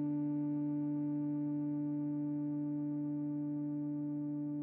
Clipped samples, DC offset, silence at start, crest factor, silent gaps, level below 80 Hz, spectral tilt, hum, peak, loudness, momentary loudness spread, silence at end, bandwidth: under 0.1%; under 0.1%; 0 s; 6 dB; none; -84 dBFS; -13 dB/octave; none; -30 dBFS; -38 LUFS; 2 LU; 0 s; 2.5 kHz